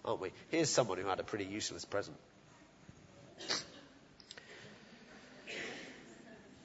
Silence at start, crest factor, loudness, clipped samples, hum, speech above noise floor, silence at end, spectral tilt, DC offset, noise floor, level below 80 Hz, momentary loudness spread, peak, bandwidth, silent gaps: 0.05 s; 26 dB; -38 LUFS; under 0.1%; none; 24 dB; 0 s; -3 dB/octave; under 0.1%; -62 dBFS; -74 dBFS; 25 LU; -16 dBFS; 7.6 kHz; none